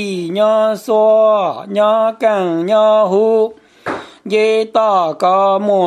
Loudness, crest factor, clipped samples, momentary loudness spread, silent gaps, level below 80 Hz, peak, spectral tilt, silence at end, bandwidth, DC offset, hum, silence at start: -13 LUFS; 12 dB; under 0.1%; 9 LU; none; -66 dBFS; 0 dBFS; -6 dB/octave; 0 s; 13 kHz; under 0.1%; none; 0 s